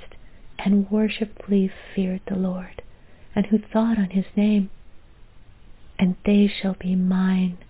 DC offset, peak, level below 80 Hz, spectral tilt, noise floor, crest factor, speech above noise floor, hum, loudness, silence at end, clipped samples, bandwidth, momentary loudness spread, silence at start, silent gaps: under 0.1%; -6 dBFS; -48 dBFS; -11.5 dB/octave; -46 dBFS; 16 dB; 24 dB; none; -23 LUFS; 0.05 s; under 0.1%; 4 kHz; 10 LU; 0 s; none